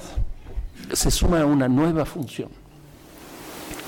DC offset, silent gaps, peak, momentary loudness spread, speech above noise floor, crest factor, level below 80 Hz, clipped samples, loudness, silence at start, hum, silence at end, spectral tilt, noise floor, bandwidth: under 0.1%; none; -12 dBFS; 19 LU; 26 dB; 12 dB; -30 dBFS; under 0.1%; -22 LUFS; 0 s; none; 0 s; -5 dB/octave; -46 dBFS; 17.5 kHz